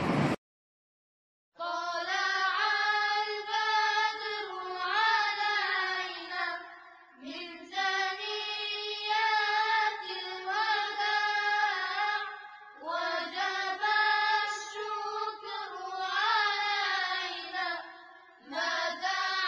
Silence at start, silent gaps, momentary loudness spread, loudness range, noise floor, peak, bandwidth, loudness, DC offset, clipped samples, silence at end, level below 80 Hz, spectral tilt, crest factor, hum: 0 s; 0.38-1.52 s; 12 LU; 3 LU; -54 dBFS; -14 dBFS; 9.6 kHz; -30 LUFS; under 0.1%; under 0.1%; 0 s; -74 dBFS; -3 dB/octave; 18 dB; none